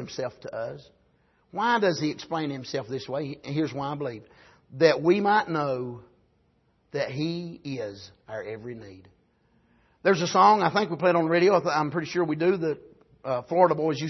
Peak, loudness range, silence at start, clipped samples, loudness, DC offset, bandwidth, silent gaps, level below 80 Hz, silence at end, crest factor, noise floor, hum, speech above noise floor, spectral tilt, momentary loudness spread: -6 dBFS; 12 LU; 0 s; under 0.1%; -25 LUFS; under 0.1%; 6.2 kHz; none; -68 dBFS; 0 s; 20 dB; -67 dBFS; none; 42 dB; -5.5 dB/octave; 17 LU